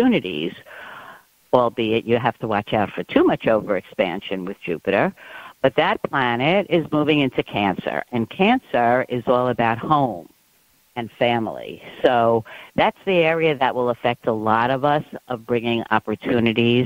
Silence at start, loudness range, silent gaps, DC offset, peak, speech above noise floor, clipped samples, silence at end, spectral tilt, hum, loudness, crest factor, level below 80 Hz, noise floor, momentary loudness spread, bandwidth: 0 s; 2 LU; none; under 0.1%; 0 dBFS; 39 dB; under 0.1%; 0 s; -7.5 dB/octave; none; -20 LUFS; 20 dB; -56 dBFS; -59 dBFS; 11 LU; 16 kHz